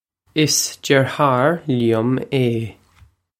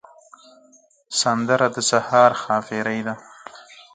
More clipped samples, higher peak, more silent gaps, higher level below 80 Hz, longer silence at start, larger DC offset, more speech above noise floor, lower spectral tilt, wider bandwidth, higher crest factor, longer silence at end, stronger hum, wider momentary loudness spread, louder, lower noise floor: neither; about the same, 0 dBFS vs -2 dBFS; neither; first, -56 dBFS vs -68 dBFS; second, 0.35 s vs 1.1 s; neither; about the same, 35 dB vs 36 dB; first, -4.5 dB/octave vs -3 dB/octave; first, 16.5 kHz vs 9.6 kHz; about the same, 18 dB vs 20 dB; first, 0.7 s vs 0.35 s; neither; second, 7 LU vs 21 LU; about the same, -18 LUFS vs -20 LUFS; about the same, -53 dBFS vs -55 dBFS